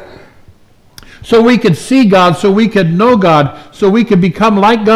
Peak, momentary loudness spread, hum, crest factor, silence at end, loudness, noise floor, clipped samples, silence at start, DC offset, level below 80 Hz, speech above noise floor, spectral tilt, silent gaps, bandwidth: 0 dBFS; 4 LU; none; 10 dB; 0 s; -9 LUFS; -42 dBFS; under 0.1%; 0 s; under 0.1%; -42 dBFS; 34 dB; -6.5 dB/octave; none; 13.5 kHz